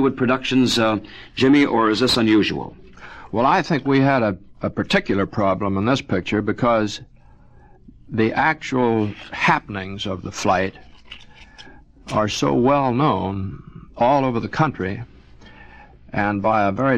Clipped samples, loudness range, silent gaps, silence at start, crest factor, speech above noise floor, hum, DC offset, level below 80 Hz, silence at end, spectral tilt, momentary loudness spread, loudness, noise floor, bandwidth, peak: under 0.1%; 5 LU; none; 0 s; 18 dB; 28 dB; none; under 0.1%; -48 dBFS; 0 s; -5.5 dB/octave; 13 LU; -20 LUFS; -48 dBFS; 13 kHz; -2 dBFS